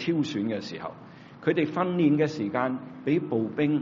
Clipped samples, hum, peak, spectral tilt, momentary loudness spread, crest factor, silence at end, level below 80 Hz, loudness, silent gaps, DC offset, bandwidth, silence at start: under 0.1%; none; -10 dBFS; -6 dB/octave; 14 LU; 18 dB; 0 s; -70 dBFS; -27 LUFS; none; under 0.1%; 7.4 kHz; 0 s